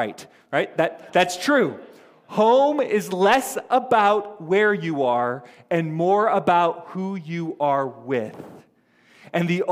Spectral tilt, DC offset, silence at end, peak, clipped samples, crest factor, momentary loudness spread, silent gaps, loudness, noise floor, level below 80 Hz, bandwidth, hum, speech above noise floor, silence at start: -5 dB/octave; under 0.1%; 0 s; -4 dBFS; under 0.1%; 18 dB; 11 LU; none; -21 LUFS; -59 dBFS; -68 dBFS; 16 kHz; none; 37 dB; 0 s